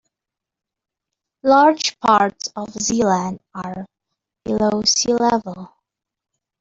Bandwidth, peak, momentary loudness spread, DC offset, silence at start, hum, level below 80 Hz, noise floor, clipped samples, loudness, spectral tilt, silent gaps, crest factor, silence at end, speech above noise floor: 8 kHz; -2 dBFS; 17 LU; under 0.1%; 1.45 s; none; -54 dBFS; -86 dBFS; under 0.1%; -17 LUFS; -3.5 dB/octave; none; 18 dB; 0.95 s; 68 dB